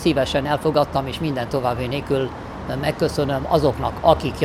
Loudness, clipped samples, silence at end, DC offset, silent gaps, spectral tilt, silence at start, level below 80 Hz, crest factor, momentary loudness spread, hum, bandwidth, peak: -21 LUFS; under 0.1%; 0 s; under 0.1%; none; -6.5 dB/octave; 0 s; -38 dBFS; 20 dB; 7 LU; none; 15.5 kHz; 0 dBFS